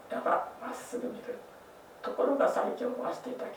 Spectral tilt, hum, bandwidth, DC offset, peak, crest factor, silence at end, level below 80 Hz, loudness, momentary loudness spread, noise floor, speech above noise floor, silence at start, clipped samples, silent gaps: -4.5 dB/octave; none; over 20 kHz; under 0.1%; -14 dBFS; 18 dB; 0 s; -76 dBFS; -33 LUFS; 17 LU; -52 dBFS; 20 dB; 0 s; under 0.1%; none